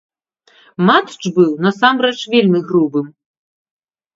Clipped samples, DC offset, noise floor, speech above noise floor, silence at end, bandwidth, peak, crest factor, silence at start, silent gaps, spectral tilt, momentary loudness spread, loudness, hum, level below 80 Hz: under 0.1%; under 0.1%; -54 dBFS; 40 dB; 1.05 s; 7.8 kHz; 0 dBFS; 16 dB; 0.8 s; none; -6 dB/octave; 8 LU; -14 LUFS; none; -64 dBFS